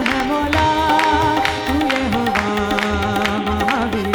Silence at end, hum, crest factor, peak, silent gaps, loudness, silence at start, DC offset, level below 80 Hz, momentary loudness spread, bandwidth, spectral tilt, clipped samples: 0 s; none; 16 dB; 0 dBFS; none; -17 LUFS; 0 s; under 0.1%; -34 dBFS; 4 LU; over 20 kHz; -5 dB/octave; under 0.1%